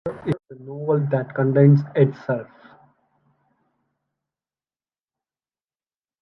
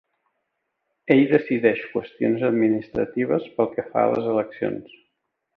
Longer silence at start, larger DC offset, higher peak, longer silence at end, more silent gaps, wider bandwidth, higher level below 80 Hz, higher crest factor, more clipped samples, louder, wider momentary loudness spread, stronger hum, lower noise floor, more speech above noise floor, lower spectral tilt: second, 0.05 s vs 1.05 s; neither; about the same, -4 dBFS vs -4 dBFS; first, 3.8 s vs 0.75 s; neither; about the same, 5.4 kHz vs 5.4 kHz; about the same, -64 dBFS vs -62 dBFS; about the same, 20 dB vs 18 dB; neither; about the same, -20 LUFS vs -22 LUFS; first, 14 LU vs 10 LU; neither; first, under -90 dBFS vs -77 dBFS; first, over 72 dB vs 55 dB; first, -11 dB/octave vs -9.5 dB/octave